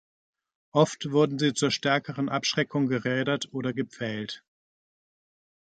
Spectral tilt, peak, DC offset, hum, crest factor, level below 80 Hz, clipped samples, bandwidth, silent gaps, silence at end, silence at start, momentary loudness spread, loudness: -5 dB/octave; -8 dBFS; under 0.1%; none; 20 dB; -70 dBFS; under 0.1%; 9.2 kHz; none; 1.3 s; 0.75 s; 8 LU; -27 LUFS